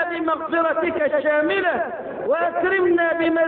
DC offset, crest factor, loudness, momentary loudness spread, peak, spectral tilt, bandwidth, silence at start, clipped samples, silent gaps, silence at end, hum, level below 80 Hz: under 0.1%; 12 dB; -20 LUFS; 5 LU; -8 dBFS; -8.5 dB/octave; 4.3 kHz; 0 s; under 0.1%; none; 0 s; none; -58 dBFS